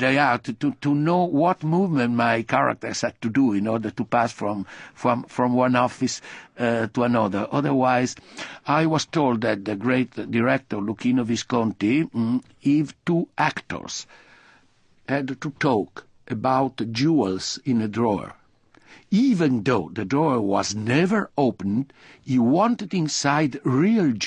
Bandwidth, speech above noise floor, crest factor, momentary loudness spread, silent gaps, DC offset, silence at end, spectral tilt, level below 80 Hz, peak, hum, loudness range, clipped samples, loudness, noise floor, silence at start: 10 kHz; 36 dB; 18 dB; 9 LU; none; under 0.1%; 0 s; -5.5 dB/octave; -58 dBFS; -4 dBFS; none; 4 LU; under 0.1%; -23 LUFS; -58 dBFS; 0 s